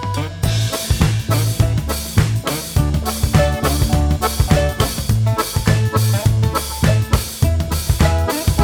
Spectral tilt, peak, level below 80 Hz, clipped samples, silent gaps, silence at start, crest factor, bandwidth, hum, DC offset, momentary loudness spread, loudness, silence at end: -5 dB/octave; 0 dBFS; -24 dBFS; under 0.1%; none; 0 s; 16 dB; over 20 kHz; none; under 0.1%; 4 LU; -17 LUFS; 0 s